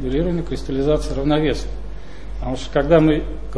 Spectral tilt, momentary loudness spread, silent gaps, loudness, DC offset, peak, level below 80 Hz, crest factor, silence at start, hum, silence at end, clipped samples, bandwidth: -7 dB/octave; 20 LU; none; -20 LUFS; 3%; -2 dBFS; -28 dBFS; 18 dB; 0 s; none; 0 s; under 0.1%; 11 kHz